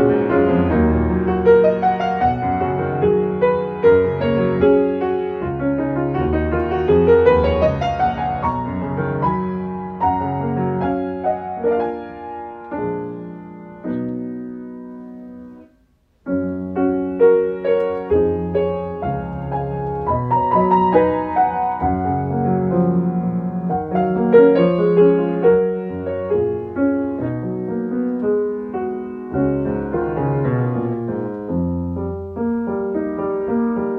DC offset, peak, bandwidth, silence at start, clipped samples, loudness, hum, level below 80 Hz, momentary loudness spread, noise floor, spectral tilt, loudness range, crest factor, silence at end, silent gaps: under 0.1%; 0 dBFS; 6.2 kHz; 0 s; under 0.1%; -19 LUFS; none; -40 dBFS; 12 LU; -58 dBFS; -10 dB/octave; 9 LU; 18 dB; 0 s; none